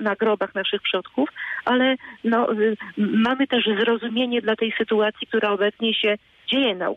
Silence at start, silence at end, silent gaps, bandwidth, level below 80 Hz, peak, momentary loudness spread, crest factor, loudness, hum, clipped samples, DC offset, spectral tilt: 0 s; 0 s; none; 5.6 kHz; -66 dBFS; -10 dBFS; 5 LU; 12 dB; -22 LUFS; none; under 0.1%; under 0.1%; -6.5 dB/octave